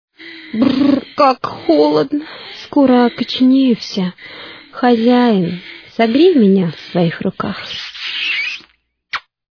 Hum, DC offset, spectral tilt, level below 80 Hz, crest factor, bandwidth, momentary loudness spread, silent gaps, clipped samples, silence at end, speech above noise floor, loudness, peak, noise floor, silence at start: none; under 0.1%; -7 dB/octave; -56 dBFS; 14 dB; 5.4 kHz; 17 LU; none; under 0.1%; 0.35 s; 40 dB; -14 LUFS; 0 dBFS; -54 dBFS; 0.2 s